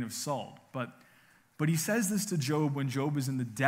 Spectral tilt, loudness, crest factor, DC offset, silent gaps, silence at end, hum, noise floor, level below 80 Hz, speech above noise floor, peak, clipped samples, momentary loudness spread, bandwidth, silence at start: -5 dB/octave; -32 LUFS; 20 dB; under 0.1%; none; 0 s; none; -63 dBFS; -76 dBFS; 32 dB; -12 dBFS; under 0.1%; 11 LU; 16 kHz; 0 s